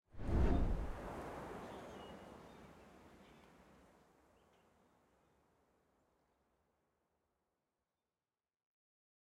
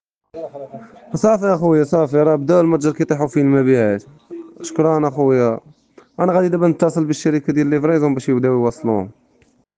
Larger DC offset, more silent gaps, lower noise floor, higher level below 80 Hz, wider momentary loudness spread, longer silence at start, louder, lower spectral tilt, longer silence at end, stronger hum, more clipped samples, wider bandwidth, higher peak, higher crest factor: neither; neither; first, under -90 dBFS vs -57 dBFS; first, -48 dBFS vs -58 dBFS; first, 26 LU vs 17 LU; second, 0.15 s vs 0.35 s; second, -43 LUFS vs -16 LUFS; about the same, -8 dB/octave vs -7.5 dB/octave; first, 6 s vs 0.65 s; neither; neither; first, 12.5 kHz vs 9.4 kHz; second, -22 dBFS vs -2 dBFS; first, 24 dB vs 14 dB